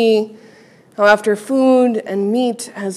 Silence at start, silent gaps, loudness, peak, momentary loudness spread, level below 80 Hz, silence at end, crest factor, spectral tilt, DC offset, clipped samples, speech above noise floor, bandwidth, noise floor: 0 s; none; -15 LUFS; 0 dBFS; 11 LU; -66 dBFS; 0 s; 16 dB; -5 dB/octave; under 0.1%; under 0.1%; 31 dB; 13 kHz; -46 dBFS